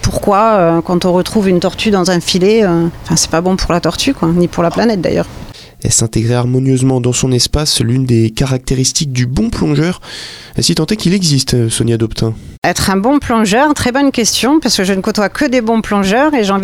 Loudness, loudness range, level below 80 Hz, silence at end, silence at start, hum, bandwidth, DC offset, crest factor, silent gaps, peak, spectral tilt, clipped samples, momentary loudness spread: -12 LUFS; 2 LU; -30 dBFS; 0 s; 0 s; none; 17 kHz; under 0.1%; 10 dB; 12.58-12.62 s; -2 dBFS; -4.5 dB/octave; under 0.1%; 5 LU